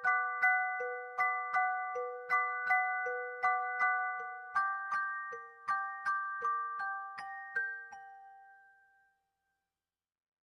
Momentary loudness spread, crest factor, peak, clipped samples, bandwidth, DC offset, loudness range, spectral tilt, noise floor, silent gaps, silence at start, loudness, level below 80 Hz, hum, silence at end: 11 LU; 18 dB; -18 dBFS; under 0.1%; 12.5 kHz; under 0.1%; 10 LU; -2 dB/octave; under -90 dBFS; none; 0 s; -34 LUFS; -84 dBFS; none; 1.85 s